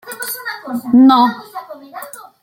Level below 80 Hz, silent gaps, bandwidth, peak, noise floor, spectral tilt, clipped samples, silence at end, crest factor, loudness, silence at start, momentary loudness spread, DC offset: -62 dBFS; none; 16.5 kHz; -2 dBFS; -33 dBFS; -4 dB/octave; under 0.1%; 0.2 s; 14 dB; -13 LUFS; 0.05 s; 22 LU; under 0.1%